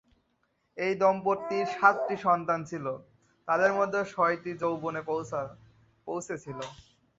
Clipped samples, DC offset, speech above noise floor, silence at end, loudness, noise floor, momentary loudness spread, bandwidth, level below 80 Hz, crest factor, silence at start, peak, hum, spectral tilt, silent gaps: under 0.1%; under 0.1%; 46 dB; 0.35 s; -29 LUFS; -74 dBFS; 17 LU; 8 kHz; -68 dBFS; 24 dB; 0.75 s; -6 dBFS; none; -5.5 dB/octave; none